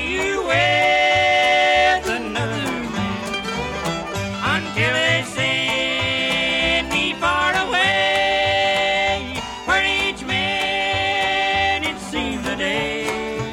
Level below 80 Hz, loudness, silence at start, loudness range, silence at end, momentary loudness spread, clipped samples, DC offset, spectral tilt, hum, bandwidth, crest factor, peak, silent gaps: -42 dBFS; -19 LUFS; 0 s; 3 LU; 0 s; 9 LU; under 0.1%; under 0.1%; -3.5 dB/octave; none; 16.5 kHz; 16 dB; -4 dBFS; none